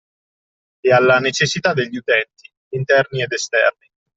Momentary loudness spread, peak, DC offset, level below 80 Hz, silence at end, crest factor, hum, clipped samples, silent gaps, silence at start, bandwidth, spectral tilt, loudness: 9 LU; -2 dBFS; under 0.1%; -60 dBFS; 0.45 s; 16 dB; none; under 0.1%; 2.57-2.71 s; 0.85 s; 8.2 kHz; -4 dB/octave; -17 LUFS